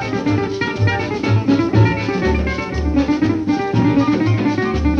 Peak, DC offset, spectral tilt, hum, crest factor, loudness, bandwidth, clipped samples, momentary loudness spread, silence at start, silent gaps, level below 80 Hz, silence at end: 0 dBFS; under 0.1%; -7.5 dB/octave; none; 16 dB; -17 LUFS; 7 kHz; under 0.1%; 4 LU; 0 s; none; -28 dBFS; 0 s